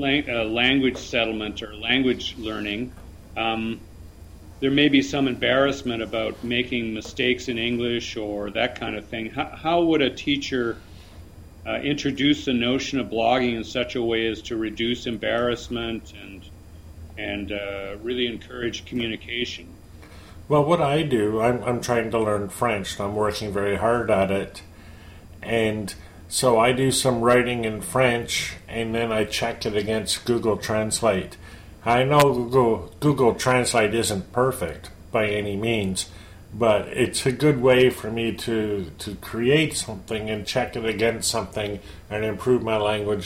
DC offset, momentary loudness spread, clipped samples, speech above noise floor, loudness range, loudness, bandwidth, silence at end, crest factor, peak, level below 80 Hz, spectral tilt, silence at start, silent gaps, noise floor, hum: under 0.1%; 12 LU; under 0.1%; 21 dB; 6 LU; -23 LUFS; 16.5 kHz; 0 s; 18 dB; -4 dBFS; -46 dBFS; -4.5 dB/octave; 0 s; none; -44 dBFS; none